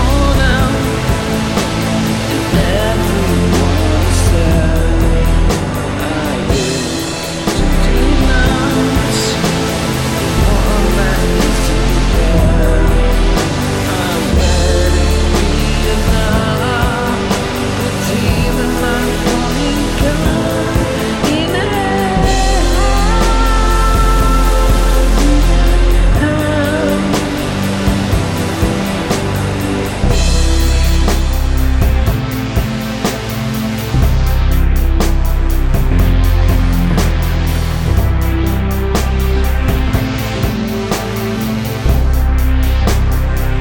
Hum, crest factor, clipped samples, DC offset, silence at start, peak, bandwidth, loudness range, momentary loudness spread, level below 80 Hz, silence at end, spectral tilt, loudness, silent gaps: none; 12 dB; under 0.1%; under 0.1%; 0 s; 0 dBFS; 17.5 kHz; 3 LU; 4 LU; -14 dBFS; 0 s; -5.5 dB/octave; -14 LUFS; none